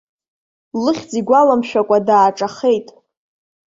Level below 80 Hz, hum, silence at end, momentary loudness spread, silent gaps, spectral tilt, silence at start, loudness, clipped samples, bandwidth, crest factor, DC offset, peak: -62 dBFS; none; 0.85 s; 8 LU; none; -5.5 dB/octave; 0.75 s; -15 LUFS; under 0.1%; 7.8 kHz; 16 dB; under 0.1%; -2 dBFS